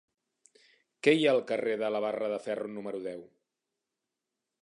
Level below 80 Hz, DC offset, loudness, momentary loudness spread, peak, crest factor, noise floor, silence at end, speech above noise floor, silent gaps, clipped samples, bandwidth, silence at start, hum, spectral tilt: -84 dBFS; under 0.1%; -30 LUFS; 13 LU; -10 dBFS; 22 dB; -88 dBFS; 1.4 s; 58 dB; none; under 0.1%; 11 kHz; 1.05 s; none; -5.5 dB/octave